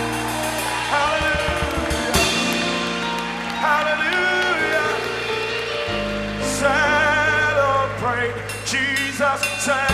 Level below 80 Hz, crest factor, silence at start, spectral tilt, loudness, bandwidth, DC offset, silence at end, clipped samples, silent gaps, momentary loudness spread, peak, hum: -38 dBFS; 18 dB; 0 s; -3 dB/octave; -20 LUFS; 14 kHz; under 0.1%; 0 s; under 0.1%; none; 6 LU; -4 dBFS; none